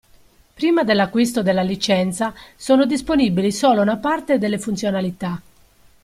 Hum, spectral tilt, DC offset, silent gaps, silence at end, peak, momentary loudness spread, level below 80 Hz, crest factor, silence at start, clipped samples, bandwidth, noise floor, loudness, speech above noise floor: none; -5.5 dB/octave; under 0.1%; none; 0.65 s; -2 dBFS; 9 LU; -50 dBFS; 16 dB; 0.6 s; under 0.1%; 15.5 kHz; -52 dBFS; -19 LUFS; 34 dB